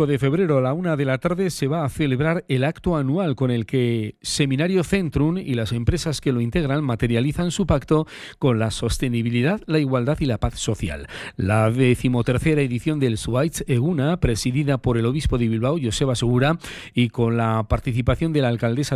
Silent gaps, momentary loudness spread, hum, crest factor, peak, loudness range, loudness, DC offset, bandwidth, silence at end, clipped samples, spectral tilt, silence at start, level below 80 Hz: none; 4 LU; none; 14 dB; -6 dBFS; 1 LU; -22 LUFS; under 0.1%; 13 kHz; 0 s; under 0.1%; -6.5 dB/octave; 0 s; -36 dBFS